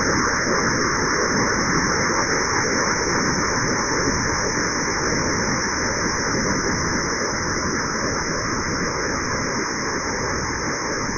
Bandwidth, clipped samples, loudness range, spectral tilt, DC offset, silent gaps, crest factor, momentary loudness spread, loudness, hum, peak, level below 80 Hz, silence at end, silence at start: 7.2 kHz; under 0.1%; 3 LU; -3 dB/octave; under 0.1%; none; 14 dB; 4 LU; -21 LUFS; none; -8 dBFS; -38 dBFS; 0 s; 0 s